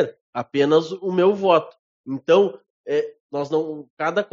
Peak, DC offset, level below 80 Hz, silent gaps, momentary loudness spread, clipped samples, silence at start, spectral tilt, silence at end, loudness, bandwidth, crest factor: -4 dBFS; under 0.1%; -70 dBFS; 0.21-0.33 s, 1.79-2.04 s, 2.70-2.84 s, 3.20-3.29 s, 3.90-3.97 s; 14 LU; under 0.1%; 0 s; -4.5 dB/octave; 0.05 s; -21 LUFS; 7.4 kHz; 18 dB